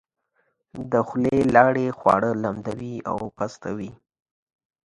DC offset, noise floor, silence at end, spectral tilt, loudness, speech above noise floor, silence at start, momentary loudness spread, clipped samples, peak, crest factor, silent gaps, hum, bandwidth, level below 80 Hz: under 0.1%; -71 dBFS; 0.9 s; -7.5 dB/octave; -22 LUFS; 48 dB; 0.75 s; 16 LU; under 0.1%; 0 dBFS; 24 dB; none; none; 11 kHz; -54 dBFS